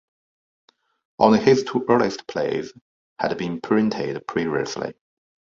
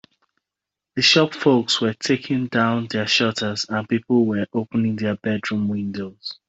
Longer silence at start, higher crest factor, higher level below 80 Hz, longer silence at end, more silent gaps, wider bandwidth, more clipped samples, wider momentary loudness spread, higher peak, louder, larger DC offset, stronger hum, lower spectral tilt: first, 1.2 s vs 0.95 s; about the same, 22 dB vs 18 dB; about the same, -60 dBFS vs -62 dBFS; first, 0.65 s vs 0.15 s; first, 2.81-3.16 s vs none; about the same, 7.6 kHz vs 8.2 kHz; neither; first, 12 LU vs 9 LU; about the same, -2 dBFS vs -4 dBFS; about the same, -22 LUFS vs -20 LUFS; neither; neither; first, -6 dB/octave vs -4.5 dB/octave